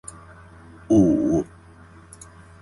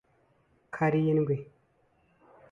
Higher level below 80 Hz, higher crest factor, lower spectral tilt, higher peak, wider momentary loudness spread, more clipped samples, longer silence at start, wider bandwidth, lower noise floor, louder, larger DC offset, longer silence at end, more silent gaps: first, -46 dBFS vs -68 dBFS; about the same, 18 dB vs 18 dB; second, -8 dB/octave vs -9.5 dB/octave; first, -6 dBFS vs -14 dBFS; first, 26 LU vs 10 LU; neither; first, 0.9 s vs 0.75 s; first, 11.5 kHz vs 7.2 kHz; second, -47 dBFS vs -68 dBFS; first, -20 LUFS vs -28 LUFS; neither; first, 1.2 s vs 1.05 s; neither